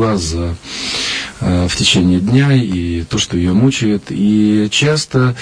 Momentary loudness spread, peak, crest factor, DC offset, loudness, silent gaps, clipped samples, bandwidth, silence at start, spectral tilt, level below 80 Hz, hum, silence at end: 7 LU; 0 dBFS; 14 dB; under 0.1%; -14 LUFS; none; under 0.1%; 10.5 kHz; 0 s; -5 dB/octave; -34 dBFS; none; 0 s